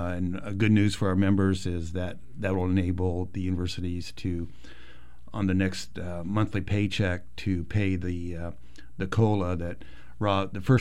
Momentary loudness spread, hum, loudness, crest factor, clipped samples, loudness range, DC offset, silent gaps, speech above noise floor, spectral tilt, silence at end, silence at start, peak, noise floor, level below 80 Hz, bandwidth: 12 LU; none; -28 LUFS; 18 dB; under 0.1%; 5 LU; 2%; none; 24 dB; -7 dB/octave; 0 s; 0 s; -10 dBFS; -51 dBFS; -46 dBFS; 11.5 kHz